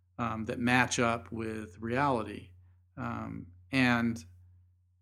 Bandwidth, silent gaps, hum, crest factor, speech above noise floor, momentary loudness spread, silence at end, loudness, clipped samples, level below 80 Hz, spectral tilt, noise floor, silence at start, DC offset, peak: 13 kHz; none; none; 24 dB; 32 dB; 16 LU; 0.65 s; -31 LUFS; under 0.1%; -64 dBFS; -5 dB/octave; -63 dBFS; 0.2 s; under 0.1%; -10 dBFS